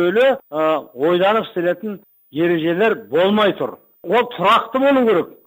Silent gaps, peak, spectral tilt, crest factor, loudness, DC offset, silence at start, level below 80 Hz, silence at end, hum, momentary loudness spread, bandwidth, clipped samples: none; -4 dBFS; -6.5 dB/octave; 12 dB; -17 LUFS; under 0.1%; 0 s; -62 dBFS; 0.15 s; none; 11 LU; 16 kHz; under 0.1%